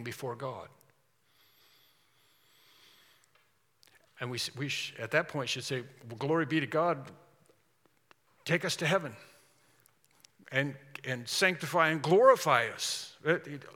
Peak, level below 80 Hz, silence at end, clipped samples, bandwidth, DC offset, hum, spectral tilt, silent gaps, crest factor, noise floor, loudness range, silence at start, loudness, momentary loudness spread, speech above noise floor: -8 dBFS; -84 dBFS; 0.05 s; under 0.1%; 17 kHz; under 0.1%; none; -4 dB/octave; none; 24 dB; -72 dBFS; 13 LU; 0 s; -30 LUFS; 15 LU; 41 dB